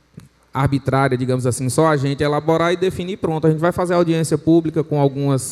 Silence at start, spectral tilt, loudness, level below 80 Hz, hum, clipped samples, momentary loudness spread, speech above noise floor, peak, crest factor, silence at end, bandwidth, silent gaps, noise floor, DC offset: 0.15 s; -6.5 dB/octave; -18 LUFS; -48 dBFS; none; under 0.1%; 4 LU; 27 dB; -2 dBFS; 16 dB; 0 s; 14 kHz; none; -45 dBFS; under 0.1%